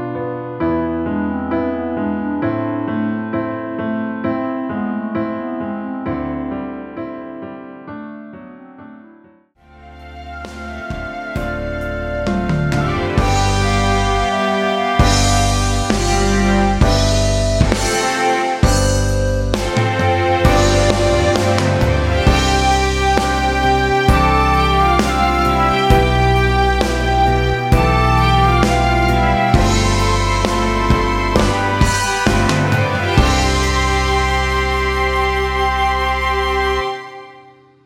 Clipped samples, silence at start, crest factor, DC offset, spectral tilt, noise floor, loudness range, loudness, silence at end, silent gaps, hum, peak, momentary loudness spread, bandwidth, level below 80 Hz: under 0.1%; 0 s; 16 dB; under 0.1%; -5 dB/octave; -49 dBFS; 12 LU; -16 LUFS; 0.45 s; none; none; 0 dBFS; 11 LU; 16 kHz; -22 dBFS